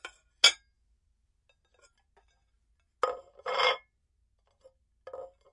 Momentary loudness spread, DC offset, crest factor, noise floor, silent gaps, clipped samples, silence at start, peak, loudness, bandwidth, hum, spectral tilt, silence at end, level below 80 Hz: 24 LU; under 0.1%; 30 dB; -74 dBFS; none; under 0.1%; 0.05 s; -6 dBFS; -27 LUFS; 11.5 kHz; none; 2 dB/octave; 0.25 s; -72 dBFS